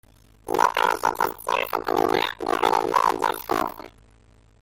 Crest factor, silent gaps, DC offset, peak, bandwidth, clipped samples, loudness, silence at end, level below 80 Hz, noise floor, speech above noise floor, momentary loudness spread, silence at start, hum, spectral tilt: 18 dB; none; under 0.1%; -6 dBFS; 17 kHz; under 0.1%; -23 LUFS; 0.75 s; -54 dBFS; -55 dBFS; 32 dB; 7 LU; 0.45 s; none; -3 dB/octave